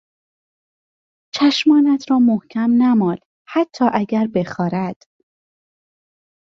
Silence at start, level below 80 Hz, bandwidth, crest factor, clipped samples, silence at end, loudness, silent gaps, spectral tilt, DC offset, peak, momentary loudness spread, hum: 1.35 s; -62 dBFS; 7.4 kHz; 16 dB; under 0.1%; 1.65 s; -17 LUFS; 3.26-3.45 s; -6 dB/octave; under 0.1%; -2 dBFS; 10 LU; none